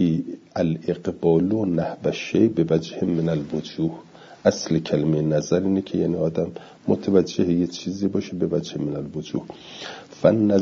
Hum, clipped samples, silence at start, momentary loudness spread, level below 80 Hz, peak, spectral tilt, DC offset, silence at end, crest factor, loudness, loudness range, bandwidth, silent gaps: none; under 0.1%; 0 s; 11 LU; -58 dBFS; -2 dBFS; -7 dB/octave; under 0.1%; 0 s; 20 dB; -23 LUFS; 2 LU; 7.6 kHz; none